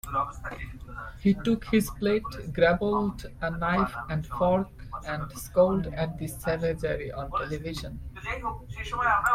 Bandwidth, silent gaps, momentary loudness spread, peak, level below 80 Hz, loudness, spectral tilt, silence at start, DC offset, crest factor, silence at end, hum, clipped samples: 16 kHz; none; 13 LU; -10 dBFS; -44 dBFS; -28 LUFS; -6 dB/octave; 0.05 s; under 0.1%; 18 dB; 0 s; none; under 0.1%